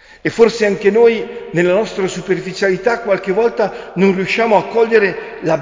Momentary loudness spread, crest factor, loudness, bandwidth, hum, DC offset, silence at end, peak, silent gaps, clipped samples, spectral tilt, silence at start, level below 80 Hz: 8 LU; 14 dB; -15 LUFS; 7.6 kHz; none; under 0.1%; 0 s; 0 dBFS; none; under 0.1%; -5.5 dB/octave; 0.25 s; -50 dBFS